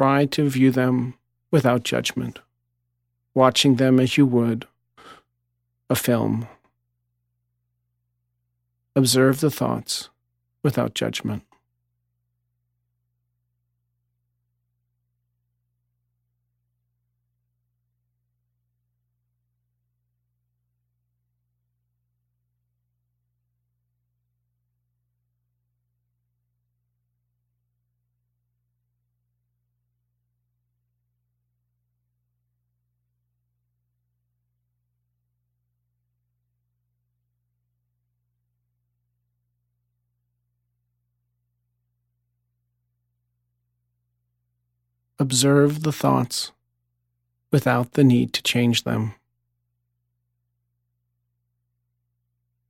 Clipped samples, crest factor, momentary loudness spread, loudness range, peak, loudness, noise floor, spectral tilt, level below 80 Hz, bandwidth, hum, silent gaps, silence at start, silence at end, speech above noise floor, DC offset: under 0.1%; 24 dB; 12 LU; 9 LU; -2 dBFS; -21 LUFS; -75 dBFS; -5 dB/octave; -64 dBFS; 16 kHz; 60 Hz at -60 dBFS; none; 0 s; 3.55 s; 56 dB; under 0.1%